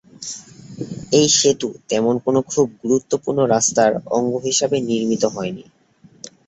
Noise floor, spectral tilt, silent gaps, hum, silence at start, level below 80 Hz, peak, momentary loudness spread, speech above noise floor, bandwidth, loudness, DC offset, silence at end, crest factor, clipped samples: -51 dBFS; -3.5 dB/octave; none; none; 0.2 s; -58 dBFS; -2 dBFS; 17 LU; 33 dB; 8.2 kHz; -18 LUFS; under 0.1%; 0.2 s; 18 dB; under 0.1%